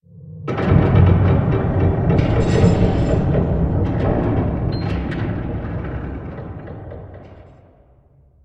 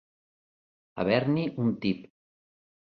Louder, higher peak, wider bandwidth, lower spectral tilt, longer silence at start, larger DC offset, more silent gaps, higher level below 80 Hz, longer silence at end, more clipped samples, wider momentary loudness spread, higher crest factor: first, -18 LUFS vs -28 LUFS; first, 0 dBFS vs -10 dBFS; first, 8 kHz vs 5.8 kHz; about the same, -9 dB/octave vs -9.5 dB/octave; second, 0.15 s vs 0.95 s; neither; neither; first, -28 dBFS vs -64 dBFS; about the same, 1 s vs 0.95 s; neither; first, 18 LU vs 10 LU; about the same, 18 dB vs 22 dB